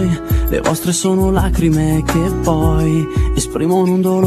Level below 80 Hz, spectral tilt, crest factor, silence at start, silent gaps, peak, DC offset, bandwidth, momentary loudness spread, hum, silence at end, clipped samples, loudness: -22 dBFS; -6 dB/octave; 14 dB; 0 s; none; 0 dBFS; under 0.1%; 14 kHz; 3 LU; none; 0 s; under 0.1%; -15 LUFS